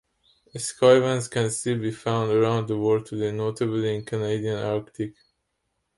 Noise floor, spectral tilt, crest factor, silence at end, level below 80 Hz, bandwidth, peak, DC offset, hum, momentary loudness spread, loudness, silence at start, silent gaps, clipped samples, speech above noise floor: -76 dBFS; -5.5 dB/octave; 20 dB; 0.85 s; -62 dBFS; 11.5 kHz; -6 dBFS; under 0.1%; none; 13 LU; -24 LUFS; 0.55 s; none; under 0.1%; 53 dB